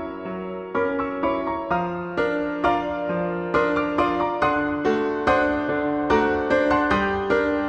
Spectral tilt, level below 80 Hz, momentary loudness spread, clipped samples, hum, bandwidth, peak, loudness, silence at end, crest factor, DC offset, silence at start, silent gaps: -7 dB/octave; -46 dBFS; 6 LU; under 0.1%; none; 8.4 kHz; -6 dBFS; -23 LUFS; 0 s; 16 dB; under 0.1%; 0 s; none